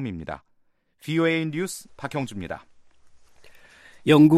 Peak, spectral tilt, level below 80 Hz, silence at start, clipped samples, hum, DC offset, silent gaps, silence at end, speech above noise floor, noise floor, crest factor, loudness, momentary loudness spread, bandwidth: -6 dBFS; -6.5 dB/octave; -58 dBFS; 0 s; under 0.1%; none; under 0.1%; none; 0 s; 43 dB; -65 dBFS; 18 dB; -25 LUFS; 18 LU; 14 kHz